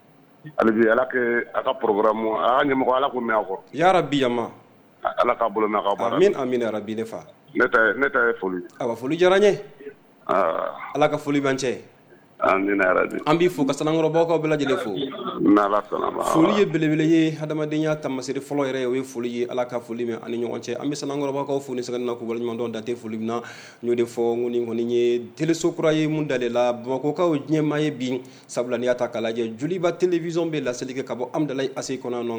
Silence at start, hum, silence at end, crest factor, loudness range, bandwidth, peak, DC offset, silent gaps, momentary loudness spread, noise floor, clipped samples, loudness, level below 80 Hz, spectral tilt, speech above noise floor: 0.45 s; none; 0 s; 18 dB; 6 LU; over 20 kHz; -4 dBFS; under 0.1%; none; 10 LU; -49 dBFS; under 0.1%; -23 LUFS; -60 dBFS; -5.5 dB/octave; 26 dB